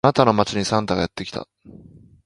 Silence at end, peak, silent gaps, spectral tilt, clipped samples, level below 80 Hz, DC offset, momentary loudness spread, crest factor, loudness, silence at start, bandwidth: 0.55 s; 0 dBFS; none; -5.5 dB/octave; under 0.1%; -48 dBFS; under 0.1%; 16 LU; 22 dB; -21 LUFS; 0.05 s; 11.5 kHz